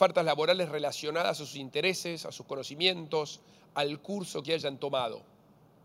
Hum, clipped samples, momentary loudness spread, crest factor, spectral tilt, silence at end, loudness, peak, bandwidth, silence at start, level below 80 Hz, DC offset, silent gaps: none; under 0.1%; 12 LU; 22 dB; -3.5 dB/octave; 0.65 s; -31 LUFS; -8 dBFS; 16 kHz; 0 s; -80 dBFS; under 0.1%; none